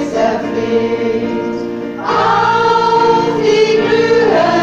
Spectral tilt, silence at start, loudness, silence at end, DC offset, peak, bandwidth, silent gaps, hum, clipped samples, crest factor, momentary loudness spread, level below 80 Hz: -5 dB/octave; 0 s; -13 LUFS; 0 s; under 0.1%; -2 dBFS; 8 kHz; none; none; under 0.1%; 12 dB; 8 LU; -46 dBFS